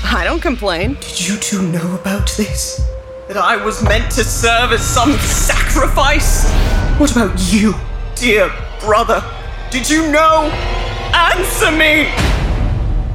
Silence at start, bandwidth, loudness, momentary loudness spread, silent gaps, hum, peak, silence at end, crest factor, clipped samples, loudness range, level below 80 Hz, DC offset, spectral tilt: 0 s; 16.5 kHz; -14 LUFS; 9 LU; none; none; -2 dBFS; 0 s; 12 dB; under 0.1%; 4 LU; -18 dBFS; under 0.1%; -4 dB/octave